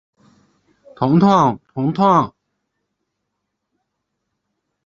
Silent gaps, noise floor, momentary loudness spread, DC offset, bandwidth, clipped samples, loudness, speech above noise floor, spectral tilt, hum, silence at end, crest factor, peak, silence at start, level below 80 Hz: none; -76 dBFS; 10 LU; under 0.1%; 7.2 kHz; under 0.1%; -16 LUFS; 62 dB; -8 dB/octave; none; 2.55 s; 20 dB; 0 dBFS; 1 s; -56 dBFS